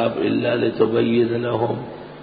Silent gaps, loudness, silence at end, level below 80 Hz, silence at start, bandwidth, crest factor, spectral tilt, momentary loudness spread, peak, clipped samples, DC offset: none; -20 LUFS; 0 s; -56 dBFS; 0 s; 4.9 kHz; 16 dB; -11.5 dB/octave; 7 LU; -4 dBFS; under 0.1%; under 0.1%